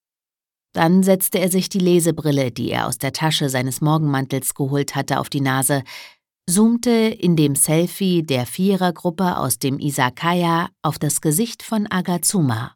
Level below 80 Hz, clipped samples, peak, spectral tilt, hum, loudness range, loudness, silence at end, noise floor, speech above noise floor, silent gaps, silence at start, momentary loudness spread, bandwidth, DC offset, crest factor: -56 dBFS; under 0.1%; -2 dBFS; -5 dB/octave; none; 2 LU; -19 LUFS; 0.05 s; under -90 dBFS; over 71 dB; none; 0.75 s; 7 LU; 19 kHz; under 0.1%; 18 dB